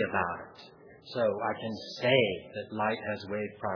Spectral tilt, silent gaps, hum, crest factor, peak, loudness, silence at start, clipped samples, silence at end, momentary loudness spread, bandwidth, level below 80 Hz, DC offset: -6 dB/octave; none; none; 22 dB; -10 dBFS; -31 LUFS; 0 s; under 0.1%; 0 s; 14 LU; 5.4 kHz; -68 dBFS; under 0.1%